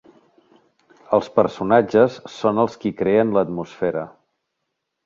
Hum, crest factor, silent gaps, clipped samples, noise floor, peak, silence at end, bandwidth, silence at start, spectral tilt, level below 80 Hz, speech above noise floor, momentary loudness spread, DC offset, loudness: none; 20 dB; none; under 0.1%; -77 dBFS; 0 dBFS; 0.95 s; 7.4 kHz; 1.1 s; -7.5 dB/octave; -58 dBFS; 59 dB; 8 LU; under 0.1%; -20 LUFS